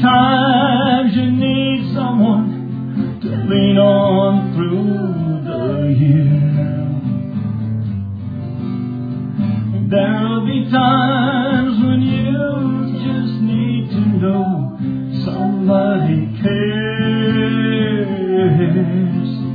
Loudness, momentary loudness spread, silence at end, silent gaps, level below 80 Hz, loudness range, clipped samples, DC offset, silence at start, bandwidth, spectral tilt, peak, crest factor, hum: -16 LUFS; 9 LU; 0 s; none; -48 dBFS; 4 LU; under 0.1%; under 0.1%; 0 s; 5 kHz; -10.5 dB/octave; -2 dBFS; 14 dB; none